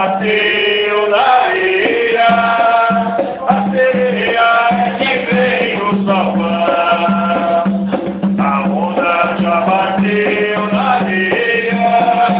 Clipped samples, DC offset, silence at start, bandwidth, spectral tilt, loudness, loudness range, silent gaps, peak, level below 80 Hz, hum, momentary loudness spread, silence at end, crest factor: under 0.1%; under 0.1%; 0 s; 5.2 kHz; -9.5 dB/octave; -13 LUFS; 2 LU; none; 0 dBFS; -50 dBFS; none; 4 LU; 0 s; 12 dB